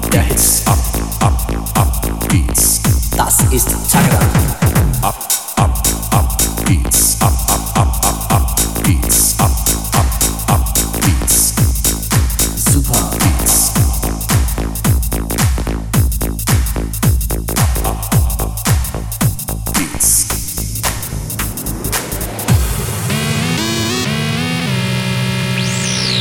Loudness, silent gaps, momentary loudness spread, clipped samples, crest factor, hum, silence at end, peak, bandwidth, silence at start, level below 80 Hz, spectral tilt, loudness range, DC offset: -14 LUFS; none; 8 LU; under 0.1%; 14 dB; none; 0 s; 0 dBFS; 19 kHz; 0 s; -20 dBFS; -3.5 dB/octave; 4 LU; 0.4%